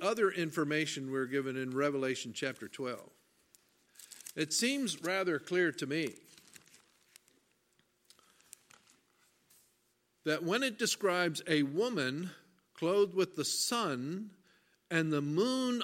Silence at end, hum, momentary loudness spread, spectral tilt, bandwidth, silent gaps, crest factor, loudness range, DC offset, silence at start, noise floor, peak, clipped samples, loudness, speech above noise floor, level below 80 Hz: 0 s; none; 11 LU; -3.5 dB/octave; 16.5 kHz; none; 22 dB; 7 LU; under 0.1%; 0 s; -76 dBFS; -14 dBFS; under 0.1%; -34 LUFS; 42 dB; -84 dBFS